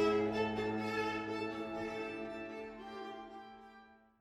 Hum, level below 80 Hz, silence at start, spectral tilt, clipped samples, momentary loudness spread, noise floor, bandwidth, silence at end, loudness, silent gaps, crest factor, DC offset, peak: none; -66 dBFS; 0 s; -6 dB/octave; under 0.1%; 17 LU; -61 dBFS; 12.5 kHz; 0.25 s; -39 LUFS; none; 18 dB; under 0.1%; -20 dBFS